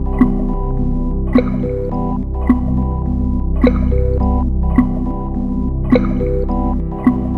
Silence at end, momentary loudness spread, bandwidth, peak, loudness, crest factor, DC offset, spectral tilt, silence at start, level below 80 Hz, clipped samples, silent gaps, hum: 0 s; 5 LU; 4.4 kHz; 0 dBFS; -17 LUFS; 14 dB; under 0.1%; -10.5 dB/octave; 0 s; -18 dBFS; under 0.1%; none; none